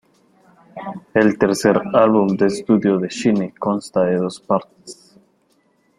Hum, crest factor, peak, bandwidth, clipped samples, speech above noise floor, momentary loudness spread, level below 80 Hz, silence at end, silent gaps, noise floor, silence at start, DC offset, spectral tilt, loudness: none; 18 dB; -2 dBFS; 13.5 kHz; under 0.1%; 44 dB; 18 LU; -58 dBFS; 1.05 s; none; -61 dBFS; 0.75 s; under 0.1%; -6 dB/octave; -18 LUFS